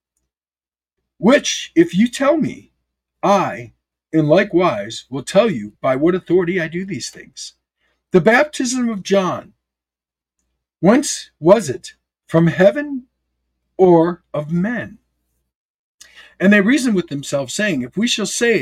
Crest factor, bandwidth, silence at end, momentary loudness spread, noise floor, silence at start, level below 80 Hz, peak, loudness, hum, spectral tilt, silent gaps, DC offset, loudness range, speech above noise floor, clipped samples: 18 dB; 15 kHz; 0 s; 14 LU; under -90 dBFS; 1.2 s; -56 dBFS; 0 dBFS; -17 LUFS; none; -5 dB/octave; 15.55-15.98 s; under 0.1%; 2 LU; over 74 dB; under 0.1%